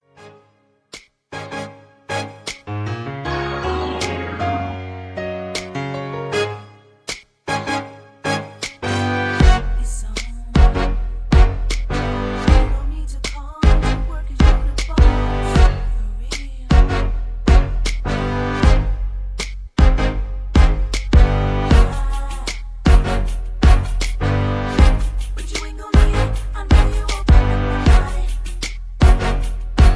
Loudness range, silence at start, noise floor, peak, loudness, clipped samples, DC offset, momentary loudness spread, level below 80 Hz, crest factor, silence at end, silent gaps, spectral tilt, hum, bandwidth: 7 LU; 0.2 s; -58 dBFS; 0 dBFS; -19 LUFS; under 0.1%; under 0.1%; 12 LU; -18 dBFS; 16 dB; 0 s; none; -6 dB/octave; none; 11 kHz